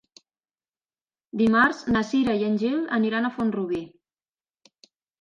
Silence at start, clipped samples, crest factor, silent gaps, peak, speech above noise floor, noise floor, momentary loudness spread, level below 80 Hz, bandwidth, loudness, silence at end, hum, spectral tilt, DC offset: 1.35 s; under 0.1%; 20 dB; none; -6 dBFS; over 67 dB; under -90 dBFS; 11 LU; -58 dBFS; 7.4 kHz; -23 LUFS; 1.35 s; none; -6 dB/octave; under 0.1%